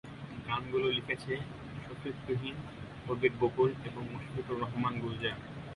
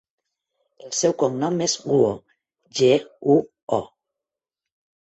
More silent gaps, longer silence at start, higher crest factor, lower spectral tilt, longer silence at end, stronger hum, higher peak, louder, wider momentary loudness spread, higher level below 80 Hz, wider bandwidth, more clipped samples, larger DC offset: second, none vs 3.63-3.68 s; second, 0.05 s vs 0.85 s; about the same, 22 dB vs 18 dB; first, -7 dB/octave vs -4.5 dB/octave; second, 0 s vs 1.25 s; neither; second, -14 dBFS vs -4 dBFS; second, -35 LUFS vs -22 LUFS; first, 14 LU vs 8 LU; first, -58 dBFS vs -64 dBFS; first, 11.5 kHz vs 8.2 kHz; neither; neither